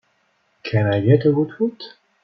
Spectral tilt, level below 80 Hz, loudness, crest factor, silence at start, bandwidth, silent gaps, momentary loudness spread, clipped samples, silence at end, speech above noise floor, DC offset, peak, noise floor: -10 dB/octave; -56 dBFS; -19 LUFS; 18 dB; 0.65 s; 6 kHz; none; 21 LU; under 0.1%; 0.35 s; 47 dB; under 0.1%; -2 dBFS; -65 dBFS